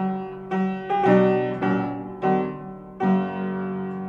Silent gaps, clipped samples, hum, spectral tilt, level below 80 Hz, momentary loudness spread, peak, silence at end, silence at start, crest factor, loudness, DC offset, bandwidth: none; under 0.1%; none; -9.5 dB/octave; -58 dBFS; 12 LU; -6 dBFS; 0 s; 0 s; 18 dB; -24 LUFS; under 0.1%; 5.2 kHz